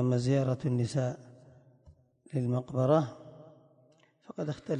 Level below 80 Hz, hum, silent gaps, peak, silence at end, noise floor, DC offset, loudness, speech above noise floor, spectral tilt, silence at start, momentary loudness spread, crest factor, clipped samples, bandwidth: -66 dBFS; none; none; -12 dBFS; 0 s; -65 dBFS; under 0.1%; -31 LUFS; 35 dB; -8 dB/octave; 0 s; 20 LU; 20 dB; under 0.1%; 10 kHz